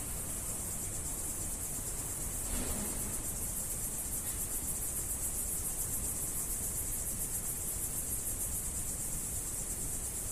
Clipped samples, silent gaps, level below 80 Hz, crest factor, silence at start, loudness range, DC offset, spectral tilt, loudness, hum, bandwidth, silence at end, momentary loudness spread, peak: under 0.1%; none; -46 dBFS; 14 dB; 0 s; 1 LU; under 0.1%; -2.5 dB/octave; -35 LUFS; none; 15.5 kHz; 0 s; 2 LU; -22 dBFS